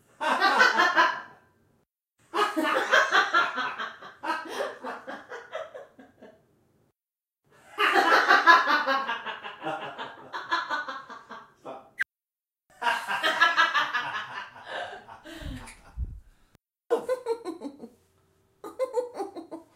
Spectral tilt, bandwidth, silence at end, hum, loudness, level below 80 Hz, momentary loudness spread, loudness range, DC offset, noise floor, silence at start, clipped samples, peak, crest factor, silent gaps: -2.5 dB/octave; 16 kHz; 0.15 s; none; -25 LUFS; -52 dBFS; 23 LU; 13 LU; under 0.1%; under -90 dBFS; 0.2 s; under 0.1%; -4 dBFS; 24 dB; none